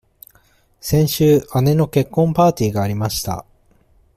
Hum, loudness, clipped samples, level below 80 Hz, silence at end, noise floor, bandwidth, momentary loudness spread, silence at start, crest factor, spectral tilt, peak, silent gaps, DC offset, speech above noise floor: none; -17 LUFS; under 0.1%; -44 dBFS; 0.75 s; -56 dBFS; 16 kHz; 9 LU; 0.85 s; 16 dB; -6.5 dB/octave; -2 dBFS; none; under 0.1%; 40 dB